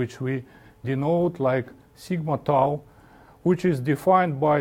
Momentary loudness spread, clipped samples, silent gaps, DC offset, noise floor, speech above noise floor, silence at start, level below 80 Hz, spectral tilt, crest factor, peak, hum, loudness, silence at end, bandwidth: 11 LU; under 0.1%; none; under 0.1%; -51 dBFS; 28 dB; 0 s; -58 dBFS; -8 dB/octave; 18 dB; -6 dBFS; none; -24 LUFS; 0 s; 17 kHz